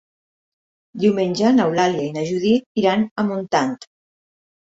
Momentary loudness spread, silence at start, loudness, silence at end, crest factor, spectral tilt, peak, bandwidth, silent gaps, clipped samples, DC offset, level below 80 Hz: 7 LU; 0.95 s; -19 LUFS; 0.85 s; 16 dB; -6 dB/octave; -4 dBFS; 7.8 kHz; 2.66-2.75 s, 3.11-3.16 s; under 0.1%; under 0.1%; -62 dBFS